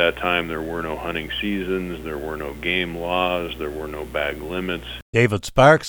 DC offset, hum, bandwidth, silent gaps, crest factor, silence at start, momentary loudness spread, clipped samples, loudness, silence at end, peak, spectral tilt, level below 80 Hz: under 0.1%; 60 Hz at -40 dBFS; over 20 kHz; 5.02-5.13 s; 22 dB; 0 s; 10 LU; under 0.1%; -23 LUFS; 0 s; 0 dBFS; -5.5 dB/octave; -40 dBFS